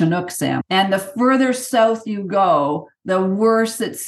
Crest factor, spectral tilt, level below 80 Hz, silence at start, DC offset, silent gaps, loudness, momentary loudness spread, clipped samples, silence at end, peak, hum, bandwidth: 14 dB; -5 dB/octave; -70 dBFS; 0 s; under 0.1%; none; -18 LUFS; 6 LU; under 0.1%; 0 s; -4 dBFS; none; 12.5 kHz